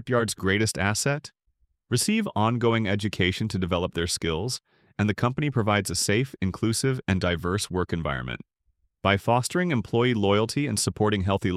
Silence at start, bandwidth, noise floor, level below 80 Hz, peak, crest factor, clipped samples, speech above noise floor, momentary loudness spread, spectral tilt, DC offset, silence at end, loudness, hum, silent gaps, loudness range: 0 s; 15.5 kHz; -71 dBFS; -50 dBFS; -6 dBFS; 20 dB; under 0.1%; 46 dB; 6 LU; -4.5 dB/octave; under 0.1%; 0 s; -25 LUFS; none; none; 1 LU